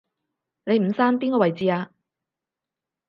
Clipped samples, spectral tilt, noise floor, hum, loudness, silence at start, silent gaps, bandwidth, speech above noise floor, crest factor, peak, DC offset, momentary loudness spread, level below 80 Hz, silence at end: under 0.1%; -9 dB/octave; -87 dBFS; none; -22 LUFS; 0.65 s; none; 5.6 kHz; 67 dB; 20 dB; -6 dBFS; under 0.1%; 12 LU; -72 dBFS; 1.2 s